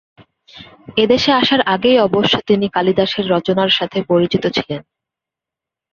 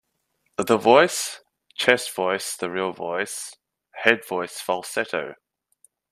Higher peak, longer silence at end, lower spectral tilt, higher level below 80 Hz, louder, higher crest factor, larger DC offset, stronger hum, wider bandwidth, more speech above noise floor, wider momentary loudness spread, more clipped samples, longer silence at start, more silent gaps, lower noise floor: about the same, -2 dBFS vs 0 dBFS; first, 1.1 s vs 0.75 s; first, -5.5 dB/octave vs -2.5 dB/octave; first, -52 dBFS vs -70 dBFS; first, -15 LUFS vs -23 LUFS; second, 16 dB vs 24 dB; neither; neither; second, 7.2 kHz vs 15 kHz; first, 71 dB vs 50 dB; second, 7 LU vs 17 LU; neither; about the same, 0.55 s vs 0.6 s; neither; first, -86 dBFS vs -73 dBFS